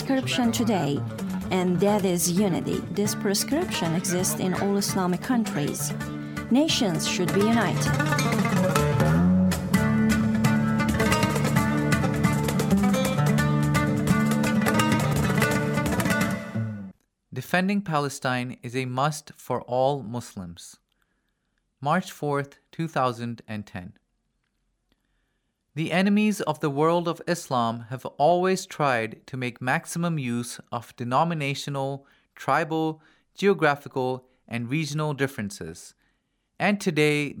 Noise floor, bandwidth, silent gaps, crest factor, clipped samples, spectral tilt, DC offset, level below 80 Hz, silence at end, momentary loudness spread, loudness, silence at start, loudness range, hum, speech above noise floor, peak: -75 dBFS; over 20 kHz; none; 20 dB; under 0.1%; -5.5 dB/octave; under 0.1%; -50 dBFS; 0 s; 12 LU; -25 LUFS; 0 s; 8 LU; none; 49 dB; -6 dBFS